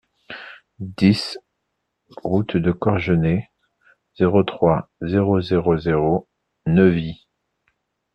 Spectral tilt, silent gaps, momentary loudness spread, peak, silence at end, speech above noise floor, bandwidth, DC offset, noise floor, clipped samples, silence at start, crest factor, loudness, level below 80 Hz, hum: -8 dB/octave; none; 18 LU; -2 dBFS; 1 s; 57 dB; 9.6 kHz; under 0.1%; -76 dBFS; under 0.1%; 0.3 s; 18 dB; -20 LUFS; -48 dBFS; none